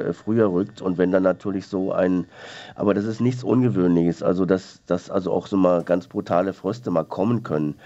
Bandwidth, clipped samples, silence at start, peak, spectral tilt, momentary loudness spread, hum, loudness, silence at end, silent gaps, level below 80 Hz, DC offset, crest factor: 8 kHz; under 0.1%; 0 s; -4 dBFS; -8.5 dB/octave; 7 LU; none; -22 LUFS; 0.1 s; none; -64 dBFS; under 0.1%; 18 dB